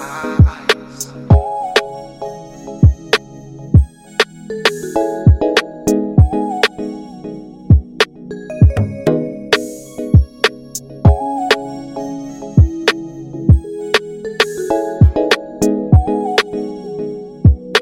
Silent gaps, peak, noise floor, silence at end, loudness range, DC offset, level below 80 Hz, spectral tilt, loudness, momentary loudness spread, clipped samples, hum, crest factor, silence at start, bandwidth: none; 0 dBFS; -33 dBFS; 0 s; 2 LU; under 0.1%; -22 dBFS; -6 dB/octave; -15 LUFS; 15 LU; under 0.1%; none; 14 dB; 0 s; 16 kHz